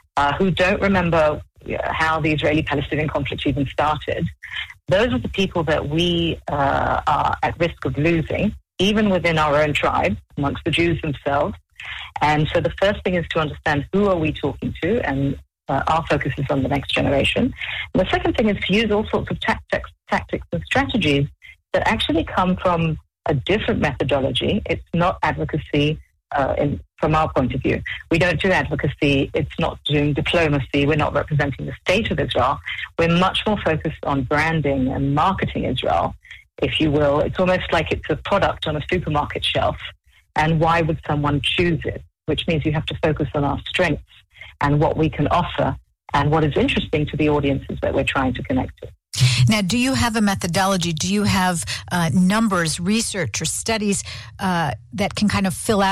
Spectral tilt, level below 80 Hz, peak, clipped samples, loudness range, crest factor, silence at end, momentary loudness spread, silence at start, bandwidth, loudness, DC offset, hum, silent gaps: -5.5 dB/octave; -38 dBFS; -4 dBFS; under 0.1%; 2 LU; 16 dB; 0 s; 7 LU; 0.15 s; 15 kHz; -20 LUFS; under 0.1%; none; none